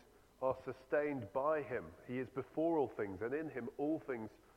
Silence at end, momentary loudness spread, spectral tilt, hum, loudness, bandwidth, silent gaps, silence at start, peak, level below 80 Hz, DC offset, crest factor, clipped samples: 0.2 s; 8 LU; -8.5 dB/octave; none; -40 LUFS; 15.5 kHz; none; 0.4 s; -22 dBFS; -72 dBFS; under 0.1%; 18 dB; under 0.1%